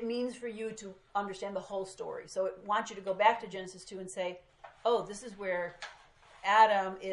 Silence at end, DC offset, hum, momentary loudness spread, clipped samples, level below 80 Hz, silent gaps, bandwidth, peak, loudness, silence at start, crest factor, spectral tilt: 0 s; under 0.1%; none; 17 LU; under 0.1%; -70 dBFS; none; 11.5 kHz; -10 dBFS; -33 LUFS; 0 s; 22 dB; -3.5 dB/octave